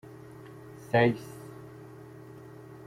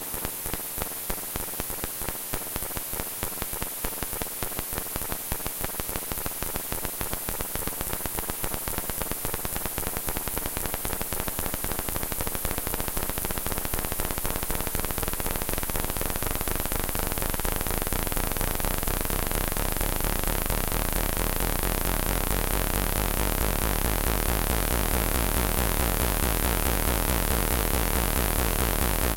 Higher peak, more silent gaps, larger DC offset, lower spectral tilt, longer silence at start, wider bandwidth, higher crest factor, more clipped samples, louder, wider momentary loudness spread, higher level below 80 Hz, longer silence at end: second, -12 dBFS vs -4 dBFS; neither; neither; first, -7 dB/octave vs -3.5 dB/octave; first, 0.45 s vs 0 s; about the same, 16 kHz vs 17.5 kHz; about the same, 22 dB vs 24 dB; neither; about the same, -27 LUFS vs -28 LUFS; first, 23 LU vs 5 LU; second, -66 dBFS vs -32 dBFS; about the same, 0.1 s vs 0 s